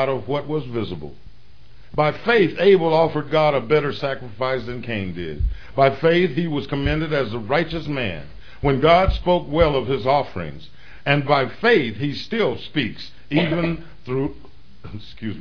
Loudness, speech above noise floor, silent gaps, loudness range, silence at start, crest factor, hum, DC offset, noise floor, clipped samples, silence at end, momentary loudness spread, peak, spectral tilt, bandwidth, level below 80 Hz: -21 LUFS; 29 dB; none; 3 LU; 0 s; 18 dB; none; 2%; -49 dBFS; under 0.1%; 0 s; 14 LU; -2 dBFS; -8 dB/octave; 5.4 kHz; -36 dBFS